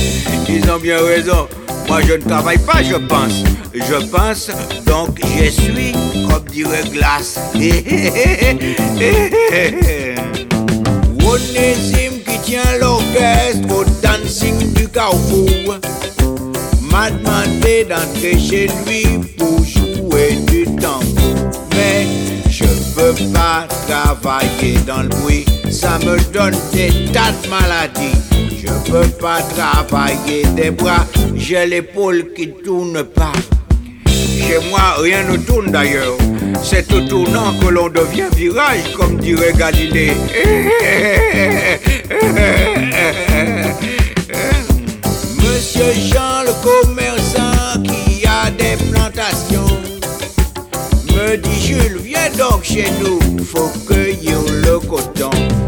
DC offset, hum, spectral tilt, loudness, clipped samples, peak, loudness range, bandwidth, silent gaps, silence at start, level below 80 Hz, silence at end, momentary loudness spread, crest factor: under 0.1%; none; -5 dB/octave; -14 LUFS; under 0.1%; 0 dBFS; 3 LU; 19.5 kHz; none; 0 s; -20 dBFS; 0 s; 6 LU; 12 dB